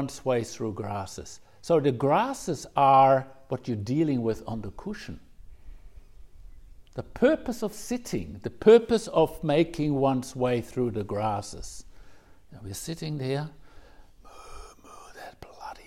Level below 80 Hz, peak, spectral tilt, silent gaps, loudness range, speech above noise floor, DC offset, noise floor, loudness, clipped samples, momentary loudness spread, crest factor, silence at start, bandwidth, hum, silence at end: -52 dBFS; -6 dBFS; -6 dB/octave; none; 13 LU; 24 dB; under 0.1%; -50 dBFS; -26 LUFS; under 0.1%; 24 LU; 20 dB; 0 s; 16 kHz; none; 0.05 s